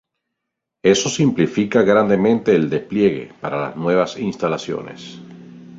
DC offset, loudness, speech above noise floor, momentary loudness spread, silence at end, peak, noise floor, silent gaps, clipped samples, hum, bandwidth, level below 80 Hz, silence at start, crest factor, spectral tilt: under 0.1%; -18 LUFS; 62 dB; 13 LU; 0 s; -2 dBFS; -80 dBFS; none; under 0.1%; none; 7.8 kHz; -56 dBFS; 0.85 s; 16 dB; -5.5 dB/octave